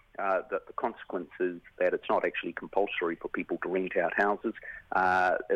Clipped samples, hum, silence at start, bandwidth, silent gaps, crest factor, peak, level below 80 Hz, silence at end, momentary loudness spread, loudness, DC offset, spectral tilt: under 0.1%; none; 0.2 s; 9.6 kHz; none; 18 dB; -12 dBFS; -66 dBFS; 0 s; 9 LU; -31 LUFS; under 0.1%; -6 dB/octave